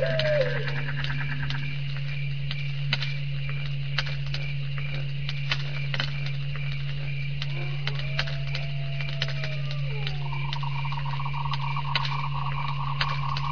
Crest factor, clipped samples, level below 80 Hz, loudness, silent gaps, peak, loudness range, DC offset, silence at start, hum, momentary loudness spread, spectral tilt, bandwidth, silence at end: 20 dB; under 0.1%; -44 dBFS; -29 LUFS; none; -10 dBFS; 1 LU; 3%; 0 s; none; 4 LU; -6.5 dB/octave; 5.4 kHz; 0 s